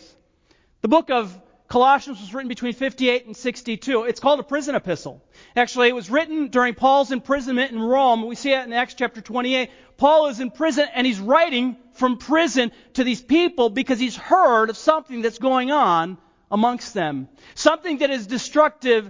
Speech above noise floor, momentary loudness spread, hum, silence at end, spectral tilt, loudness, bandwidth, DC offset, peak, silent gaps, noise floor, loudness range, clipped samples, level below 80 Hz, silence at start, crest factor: 40 dB; 10 LU; none; 0 s; -4 dB/octave; -20 LUFS; 7.6 kHz; under 0.1%; 0 dBFS; none; -60 dBFS; 3 LU; under 0.1%; -58 dBFS; 0.85 s; 20 dB